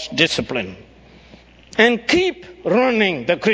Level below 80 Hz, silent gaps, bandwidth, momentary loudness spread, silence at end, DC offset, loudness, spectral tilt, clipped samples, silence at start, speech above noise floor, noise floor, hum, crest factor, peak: -48 dBFS; none; 8 kHz; 11 LU; 0 s; under 0.1%; -18 LUFS; -4 dB/octave; under 0.1%; 0 s; 28 dB; -46 dBFS; none; 20 dB; 0 dBFS